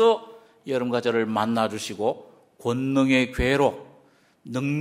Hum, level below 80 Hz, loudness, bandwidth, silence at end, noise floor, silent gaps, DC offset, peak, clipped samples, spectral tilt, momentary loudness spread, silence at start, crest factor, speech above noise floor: none; -44 dBFS; -24 LUFS; 15 kHz; 0 s; -58 dBFS; none; under 0.1%; -6 dBFS; under 0.1%; -5.5 dB/octave; 12 LU; 0 s; 18 dB; 35 dB